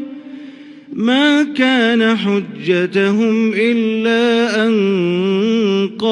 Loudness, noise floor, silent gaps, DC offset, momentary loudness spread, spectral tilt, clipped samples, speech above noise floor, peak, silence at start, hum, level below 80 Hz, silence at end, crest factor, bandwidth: -15 LUFS; -35 dBFS; none; under 0.1%; 7 LU; -6 dB/octave; under 0.1%; 21 dB; 0 dBFS; 0 s; none; -66 dBFS; 0 s; 14 dB; 10.5 kHz